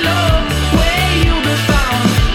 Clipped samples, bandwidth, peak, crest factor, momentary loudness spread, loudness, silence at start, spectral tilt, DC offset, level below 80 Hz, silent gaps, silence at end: under 0.1%; 18 kHz; 0 dBFS; 12 dB; 2 LU; -13 LUFS; 0 s; -4.5 dB/octave; under 0.1%; -18 dBFS; none; 0 s